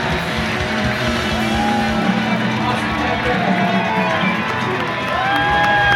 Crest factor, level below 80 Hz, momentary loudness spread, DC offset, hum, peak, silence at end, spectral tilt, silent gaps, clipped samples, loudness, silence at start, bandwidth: 16 dB; -36 dBFS; 4 LU; under 0.1%; none; -2 dBFS; 0 s; -5 dB/octave; none; under 0.1%; -17 LUFS; 0 s; 16 kHz